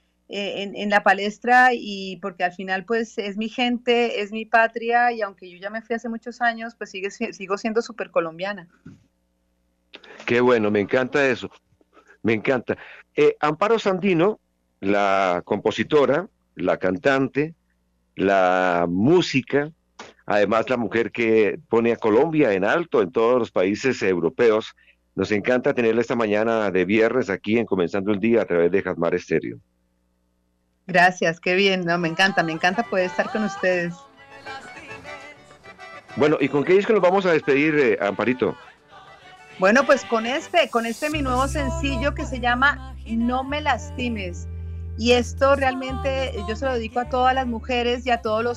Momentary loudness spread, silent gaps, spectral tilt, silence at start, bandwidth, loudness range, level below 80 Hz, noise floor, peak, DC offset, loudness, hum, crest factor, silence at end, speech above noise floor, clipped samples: 13 LU; none; -5.5 dB/octave; 0.3 s; 12.5 kHz; 5 LU; -42 dBFS; -68 dBFS; -6 dBFS; under 0.1%; -21 LUFS; none; 16 dB; 0 s; 47 dB; under 0.1%